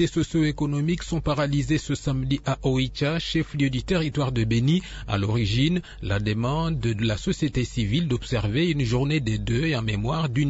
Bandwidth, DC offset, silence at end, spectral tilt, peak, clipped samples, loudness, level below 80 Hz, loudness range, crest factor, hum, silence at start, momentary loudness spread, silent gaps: 8 kHz; under 0.1%; 0 s; -6.5 dB/octave; -10 dBFS; under 0.1%; -25 LUFS; -38 dBFS; 1 LU; 14 dB; none; 0 s; 3 LU; none